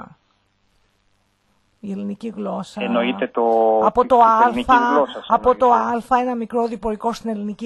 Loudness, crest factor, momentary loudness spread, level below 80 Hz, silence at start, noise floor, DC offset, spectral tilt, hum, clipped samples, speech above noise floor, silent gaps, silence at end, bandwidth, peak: -18 LUFS; 20 dB; 14 LU; -50 dBFS; 0 s; -64 dBFS; under 0.1%; -6 dB/octave; none; under 0.1%; 46 dB; none; 0 s; 12 kHz; 0 dBFS